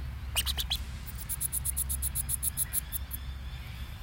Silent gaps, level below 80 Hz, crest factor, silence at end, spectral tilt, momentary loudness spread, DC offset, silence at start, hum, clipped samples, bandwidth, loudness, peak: none; -40 dBFS; 20 dB; 0 s; -1.5 dB/octave; 12 LU; under 0.1%; 0 s; none; under 0.1%; 17 kHz; -32 LUFS; -14 dBFS